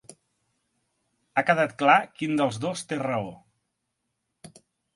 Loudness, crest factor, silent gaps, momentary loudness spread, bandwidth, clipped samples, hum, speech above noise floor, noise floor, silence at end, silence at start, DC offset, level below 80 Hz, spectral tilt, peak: -25 LUFS; 24 dB; none; 11 LU; 11.5 kHz; under 0.1%; none; 55 dB; -80 dBFS; 0.5 s; 1.35 s; under 0.1%; -70 dBFS; -5 dB/octave; -4 dBFS